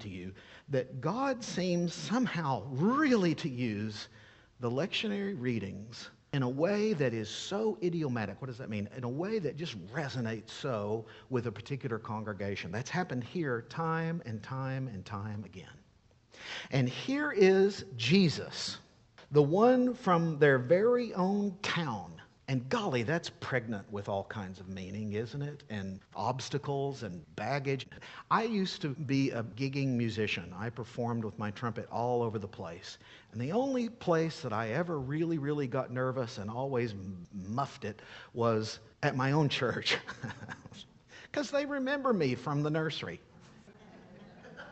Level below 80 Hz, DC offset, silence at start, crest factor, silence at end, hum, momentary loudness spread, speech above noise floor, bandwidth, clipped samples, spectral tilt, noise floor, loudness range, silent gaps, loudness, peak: -68 dBFS; under 0.1%; 0 s; 22 dB; 0 s; none; 15 LU; 32 dB; 8.4 kHz; under 0.1%; -6 dB/octave; -65 dBFS; 9 LU; none; -33 LUFS; -12 dBFS